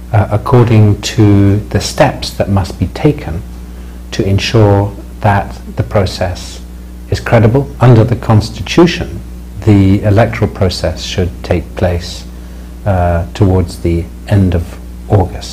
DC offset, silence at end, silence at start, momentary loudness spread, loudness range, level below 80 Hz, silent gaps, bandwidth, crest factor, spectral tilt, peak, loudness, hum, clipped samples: under 0.1%; 0 s; 0 s; 17 LU; 4 LU; -26 dBFS; none; 15 kHz; 12 dB; -7 dB/octave; 0 dBFS; -12 LUFS; none; 1%